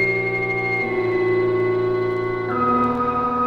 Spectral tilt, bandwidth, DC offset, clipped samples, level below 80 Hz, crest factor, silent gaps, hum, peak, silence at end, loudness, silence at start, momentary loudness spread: -8.5 dB/octave; 6.2 kHz; under 0.1%; under 0.1%; -48 dBFS; 12 dB; none; none; -8 dBFS; 0 s; -20 LUFS; 0 s; 3 LU